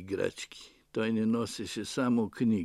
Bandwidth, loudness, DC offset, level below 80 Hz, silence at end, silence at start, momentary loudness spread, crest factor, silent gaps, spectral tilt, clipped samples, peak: 12.5 kHz; -32 LUFS; under 0.1%; -68 dBFS; 0 s; 0 s; 13 LU; 16 dB; none; -5.5 dB/octave; under 0.1%; -16 dBFS